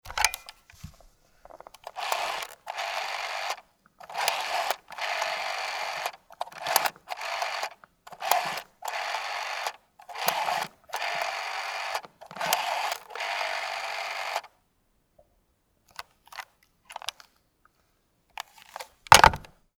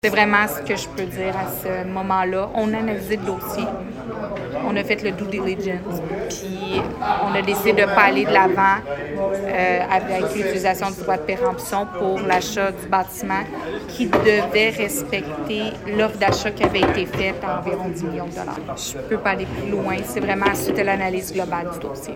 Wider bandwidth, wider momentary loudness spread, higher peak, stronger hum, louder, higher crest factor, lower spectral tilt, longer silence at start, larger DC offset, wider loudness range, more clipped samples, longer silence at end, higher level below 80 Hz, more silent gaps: first, over 20 kHz vs 17 kHz; first, 17 LU vs 11 LU; about the same, 0 dBFS vs 0 dBFS; neither; second, -28 LUFS vs -21 LUFS; first, 30 dB vs 20 dB; second, -1 dB/octave vs -4.5 dB/octave; about the same, 0.05 s vs 0.05 s; neither; first, 14 LU vs 6 LU; neither; first, 0.3 s vs 0 s; second, -52 dBFS vs -44 dBFS; neither